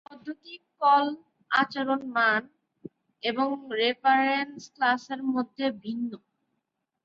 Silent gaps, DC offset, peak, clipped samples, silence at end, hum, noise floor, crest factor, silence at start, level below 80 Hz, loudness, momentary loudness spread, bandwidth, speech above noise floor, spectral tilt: none; under 0.1%; -10 dBFS; under 0.1%; 0.85 s; none; -81 dBFS; 18 dB; 0.1 s; -78 dBFS; -26 LUFS; 18 LU; 7.6 kHz; 55 dB; -4 dB/octave